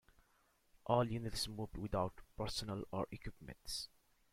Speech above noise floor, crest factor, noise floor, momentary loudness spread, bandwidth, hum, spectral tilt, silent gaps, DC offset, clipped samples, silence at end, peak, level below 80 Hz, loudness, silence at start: 34 dB; 24 dB; -75 dBFS; 16 LU; 16 kHz; none; -5 dB/octave; none; under 0.1%; under 0.1%; 0.45 s; -20 dBFS; -58 dBFS; -42 LUFS; 0.85 s